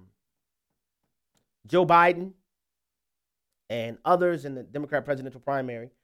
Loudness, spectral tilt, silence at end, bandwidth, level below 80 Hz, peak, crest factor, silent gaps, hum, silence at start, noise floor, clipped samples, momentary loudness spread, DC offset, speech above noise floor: -25 LUFS; -7 dB/octave; 0.15 s; 13.5 kHz; -68 dBFS; -6 dBFS; 22 dB; none; none; 1.65 s; -87 dBFS; under 0.1%; 16 LU; under 0.1%; 62 dB